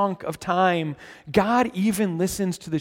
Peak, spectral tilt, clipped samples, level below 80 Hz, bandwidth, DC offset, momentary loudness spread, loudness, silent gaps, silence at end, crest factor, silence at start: -4 dBFS; -5.5 dB/octave; under 0.1%; -52 dBFS; 17 kHz; under 0.1%; 8 LU; -23 LUFS; none; 0 s; 18 dB; 0 s